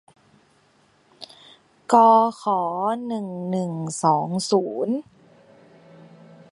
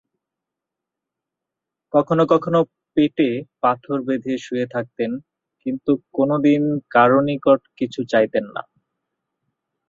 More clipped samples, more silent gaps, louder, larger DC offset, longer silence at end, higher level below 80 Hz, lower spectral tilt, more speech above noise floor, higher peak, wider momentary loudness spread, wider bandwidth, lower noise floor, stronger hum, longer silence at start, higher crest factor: neither; neither; about the same, -21 LUFS vs -20 LUFS; neither; first, 1.5 s vs 1.3 s; second, -72 dBFS vs -64 dBFS; second, -6 dB/octave vs -7.5 dB/octave; second, 39 dB vs 66 dB; about the same, -2 dBFS vs -2 dBFS; first, 26 LU vs 10 LU; first, 11.5 kHz vs 7.4 kHz; second, -60 dBFS vs -85 dBFS; neither; second, 1.2 s vs 1.95 s; about the same, 22 dB vs 20 dB